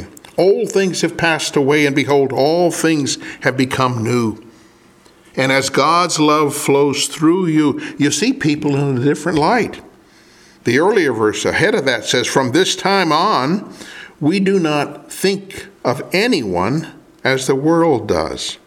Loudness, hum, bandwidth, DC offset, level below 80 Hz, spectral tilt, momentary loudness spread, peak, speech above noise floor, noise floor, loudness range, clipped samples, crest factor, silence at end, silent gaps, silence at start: -16 LUFS; none; 17 kHz; under 0.1%; -52 dBFS; -4.5 dB/octave; 8 LU; 0 dBFS; 32 dB; -48 dBFS; 3 LU; under 0.1%; 16 dB; 0.1 s; none; 0 s